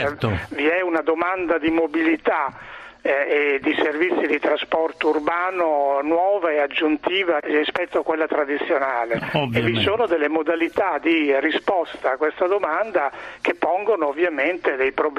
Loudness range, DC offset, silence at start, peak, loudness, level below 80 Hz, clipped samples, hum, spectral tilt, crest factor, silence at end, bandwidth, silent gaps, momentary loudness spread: 1 LU; under 0.1%; 0 s; -4 dBFS; -21 LUFS; -56 dBFS; under 0.1%; none; -6.5 dB/octave; 18 dB; 0 s; 9.6 kHz; none; 4 LU